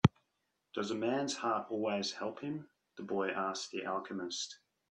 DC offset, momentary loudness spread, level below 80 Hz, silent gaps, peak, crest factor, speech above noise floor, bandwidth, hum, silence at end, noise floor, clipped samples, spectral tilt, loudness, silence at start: under 0.1%; 10 LU; -66 dBFS; none; -10 dBFS; 28 dB; 46 dB; 10.5 kHz; none; 0.35 s; -83 dBFS; under 0.1%; -5 dB/octave; -37 LUFS; 0.05 s